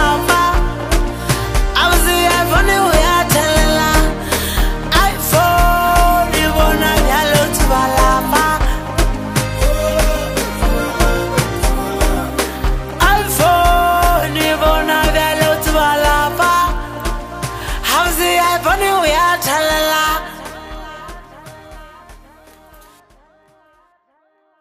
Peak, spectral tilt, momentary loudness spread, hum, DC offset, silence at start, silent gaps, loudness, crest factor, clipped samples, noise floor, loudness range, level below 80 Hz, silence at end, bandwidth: 0 dBFS; -3.5 dB/octave; 7 LU; none; under 0.1%; 0 s; none; -14 LUFS; 14 dB; under 0.1%; -59 dBFS; 4 LU; -20 dBFS; 2.45 s; 15.5 kHz